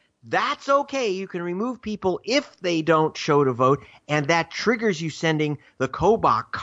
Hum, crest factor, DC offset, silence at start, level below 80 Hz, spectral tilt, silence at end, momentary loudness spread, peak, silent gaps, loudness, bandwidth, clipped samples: none; 16 dB; under 0.1%; 0.25 s; -54 dBFS; -5.5 dB/octave; 0 s; 8 LU; -6 dBFS; none; -23 LUFS; 8 kHz; under 0.1%